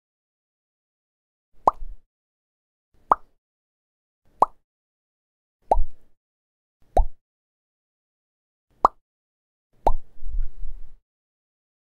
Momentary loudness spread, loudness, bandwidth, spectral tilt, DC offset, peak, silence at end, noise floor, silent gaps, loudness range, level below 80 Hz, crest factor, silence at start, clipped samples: 16 LU; -25 LUFS; 4.3 kHz; -7.5 dB/octave; under 0.1%; -2 dBFS; 0.9 s; under -90 dBFS; 2.06-2.92 s, 3.38-4.22 s, 4.64-5.60 s, 6.17-6.80 s, 7.21-8.68 s, 9.01-9.70 s; 3 LU; -32 dBFS; 26 dB; 1.65 s; under 0.1%